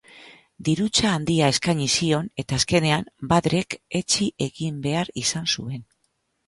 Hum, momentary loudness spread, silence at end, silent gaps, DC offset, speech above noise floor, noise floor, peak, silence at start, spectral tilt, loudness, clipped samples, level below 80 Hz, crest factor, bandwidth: none; 8 LU; 0.65 s; none; under 0.1%; 49 dB; -72 dBFS; -4 dBFS; 0.15 s; -4 dB/octave; -23 LUFS; under 0.1%; -50 dBFS; 18 dB; 11.5 kHz